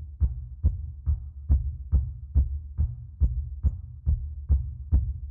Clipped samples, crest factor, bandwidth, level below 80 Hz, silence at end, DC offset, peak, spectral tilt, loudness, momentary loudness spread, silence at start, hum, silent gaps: under 0.1%; 16 dB; 1.3 kHz; -28 dBFS; 0 s; under 0.1%; -12 dBFS; -13.5 dB/octave; -30 LUFS; 4 LU; 0 s; none; none